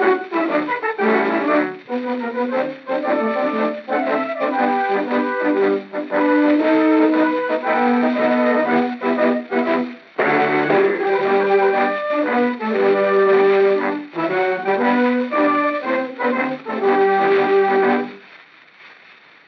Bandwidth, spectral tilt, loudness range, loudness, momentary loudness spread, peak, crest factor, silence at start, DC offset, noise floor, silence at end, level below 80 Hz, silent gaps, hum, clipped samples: 6 kHz; -3.5 dB/octave; 3 LU; -18 LUFS; 7 LU; -2 dBFS; 14 dB; 0 s; under 0.1%; -47 dBFS; 0.55 s; -86 dBFS; none; none; under 0.1%